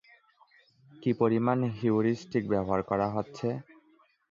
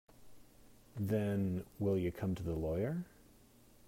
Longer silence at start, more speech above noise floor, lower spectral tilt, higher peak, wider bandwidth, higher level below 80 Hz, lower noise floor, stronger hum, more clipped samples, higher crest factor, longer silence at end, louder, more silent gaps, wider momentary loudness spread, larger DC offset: first, 1 s vs 0.2 s; first, 37 dB vs 27 dB; about the same, -8.5 dB/octave vs -8.5 dB/octave; first, -12 dBFS vs -24 dBFS; second, 7.4 kHz vs 16 kHz; about the same, -60 dBFS vs -58 dBFS; about the same, -65 dBFS vs -63 dBFS; neither; neither; about the same, 18 dB vs 16 dB; about the same, 0.7 s vs 0.8 s; first, -29 LUFS vs -38 LUFS; neither; about the same, 8 LU vs 9 LU; neither